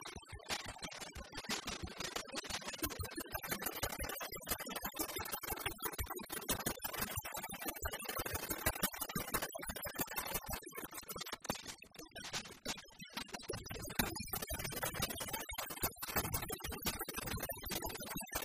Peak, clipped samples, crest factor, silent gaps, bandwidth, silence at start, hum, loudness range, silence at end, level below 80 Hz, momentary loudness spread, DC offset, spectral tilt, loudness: -16 dBFS; under 0.1%; 26 dB; none; 15.5 kHz; 0 s; none; 4 LU; 0 s; -56 dBFS; 7 LU; under 0.1%; -2.5 dB/octave; -42 LUFS